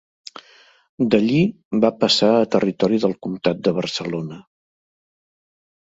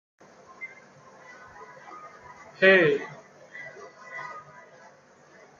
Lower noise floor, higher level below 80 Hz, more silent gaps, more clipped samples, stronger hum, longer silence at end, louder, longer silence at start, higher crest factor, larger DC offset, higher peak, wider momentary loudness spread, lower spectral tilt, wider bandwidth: about the same, -52 dBFS vs -55 dBFS; first, -60 dBFS vs -76 dBFS; first, 1.65-1.71 s vs none; neither; neither; first, 1.45 s vs 1.2 s; about the same, -19 LUFS vs -21 LUFS; first, 1 s vs 0.6 s; about the same, 20 dB vs 24 dB; neither; first, -2 dBFS vs -6 dBFS; second, 14 LU vs 29 LU; about the same, -5.5 dB/octave vs -5.5 dB/octave; about the same, 7.8 kHz vs 7.2 kHz